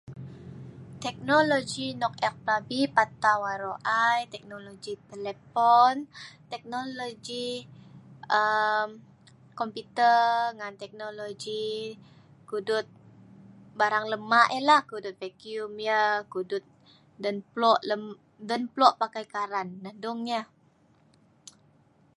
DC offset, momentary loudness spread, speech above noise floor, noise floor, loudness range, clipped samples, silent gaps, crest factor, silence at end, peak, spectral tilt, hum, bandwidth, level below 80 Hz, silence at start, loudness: under 0.1%; 19 LU; 36 dB; -63 dBFS; 5 LU; under 0.1%; none; 24 dB; 1.75 s; -4 dBFS; -4 dB/octave; none; 11.5 kHz; -70 dBFS; 0.1 s; -27 LUFS